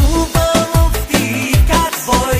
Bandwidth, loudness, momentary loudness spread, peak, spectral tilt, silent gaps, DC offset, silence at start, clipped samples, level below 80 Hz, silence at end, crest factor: 15.5 kHz; -14 LUFS; 3 LU; 0 dBFS; -4.5 dB/octave; none; under 0.1%; 0 s; under 0.1%; -18 dBFS; 0 s; 12 dB